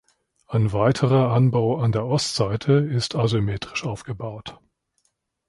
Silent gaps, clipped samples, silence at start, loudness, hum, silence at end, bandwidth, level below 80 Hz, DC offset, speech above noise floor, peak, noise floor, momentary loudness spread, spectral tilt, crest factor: none; under 0.1%; 0.5 s; -22 LUFS; none; 0.95 s; 11.5 kHz; -50 dBFS; under 0.1%; 50 dB; -6 dBFS; -71 dBFS; 13 LU; -6.5 dB/octave; 18 dB